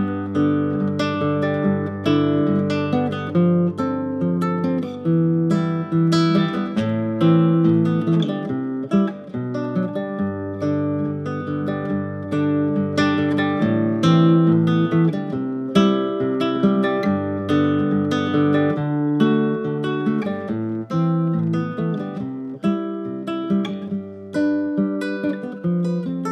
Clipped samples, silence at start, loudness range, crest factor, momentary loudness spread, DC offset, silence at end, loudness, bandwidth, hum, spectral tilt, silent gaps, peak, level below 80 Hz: under 0.1%; 0 s; 6 LU; 18 dB; 8 LU; under 0.1%; 0 s; -21 LUFS; 8.6 kHz; none; -8 dB/octave; none; -2 dBFS; -62 dBFS